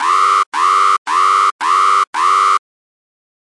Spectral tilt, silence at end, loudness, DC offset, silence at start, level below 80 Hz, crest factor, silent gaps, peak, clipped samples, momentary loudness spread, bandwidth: 2.5 dB/octave; 0.85 s; -12 LUFS; under 0.1%; 0 s; under -90 dBFS; 12 dB; 0.46-0.52 s, 0.98-1.05 s, 1.52-1.59 s, 2.07-2.13 s; -2 dBFS; under 0.1%; 2 LU; 11.5 kHz